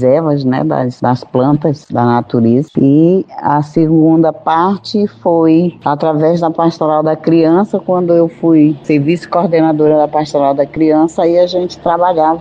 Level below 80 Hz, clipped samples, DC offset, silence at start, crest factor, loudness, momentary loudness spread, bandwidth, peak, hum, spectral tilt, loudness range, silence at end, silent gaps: -50 dBFS; under 0.1%; under 0.1%; 0 s; 10 dB; -11 LUFS; 5 LU; 7.8 kHz; 0 dBFS; none; -8.5 dB/octave; 1 LU; 0 s; none